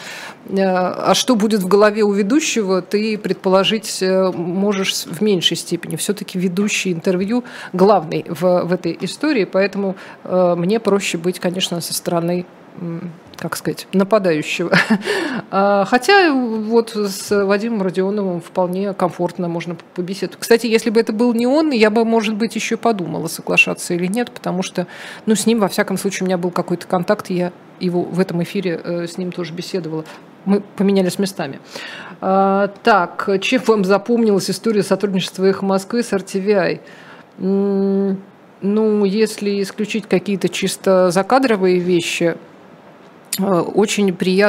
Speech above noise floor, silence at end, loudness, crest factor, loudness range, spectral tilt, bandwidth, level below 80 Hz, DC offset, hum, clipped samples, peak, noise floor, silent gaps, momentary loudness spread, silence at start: 26 dB; 0 s; -17 LUFS; 18 dB; 5 LU; -5 dB/octave; 16 kHz; -66 dBFS; under 0.1%; none; under 0.1%; 0 dBFS; -43 dBFS; none; 10 LU; 0 s